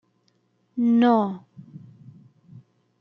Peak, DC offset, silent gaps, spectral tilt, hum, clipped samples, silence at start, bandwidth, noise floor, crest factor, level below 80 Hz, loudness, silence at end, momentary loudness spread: -6 dBFS; under 0.1%; none; -8.5 dB/octave; 60 Hz at -40 dBFS; under 0.1%; 0.75 s; 5.4 kHz; -67 dBFS; 18 dB; -76 dBFS; -21 LUFS; 1.25 s; 27 LU